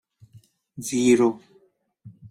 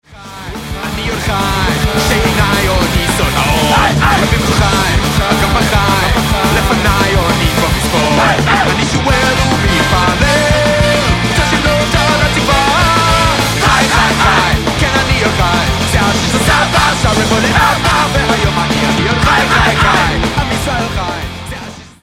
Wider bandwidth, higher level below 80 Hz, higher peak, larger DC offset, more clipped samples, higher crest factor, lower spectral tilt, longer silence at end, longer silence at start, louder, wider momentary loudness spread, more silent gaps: about the same, 15 kHz vs 16.5 kHz; second, -68 dBFS vs -22 dBFS; second, -6 dBFS vs 0 dBFS; neither; neither; first, 18 dB vs 12 dB; about the same, -5 dB/octave vs -4 dB/octave; second, 0 s vs 0.15 s; first, 0.75 s vs 0.1 s; second, -21 LUFS vs -11 LUFS; first, 23 LU vs 6 LU; neither